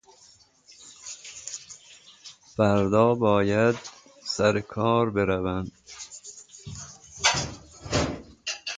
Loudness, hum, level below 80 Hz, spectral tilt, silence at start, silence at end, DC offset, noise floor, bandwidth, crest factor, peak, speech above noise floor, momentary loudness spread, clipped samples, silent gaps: -25 LUFS; none; -50 dBFS; -4.5 dB/octave; 0.8 s; 0 s; under 0.1%; -57 dBFS; 9.6 kHz; 22 dB; -6 dBFS; 34 dB; 22 LU; under 0.1%; none